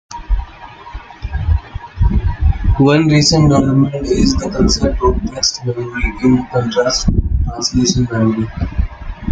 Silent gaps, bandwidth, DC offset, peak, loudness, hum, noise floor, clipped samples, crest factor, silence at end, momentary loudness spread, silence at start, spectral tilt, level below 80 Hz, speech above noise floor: none; 9.4 kHz; under 0.1%; 0 dBFS; -15 LUFS; none; -34 dBFS; under 0.1%; 14 dB; 0 s; 14 LU; 0.1 s; -5.5 dB/octave; -22 dBFS; 21 dB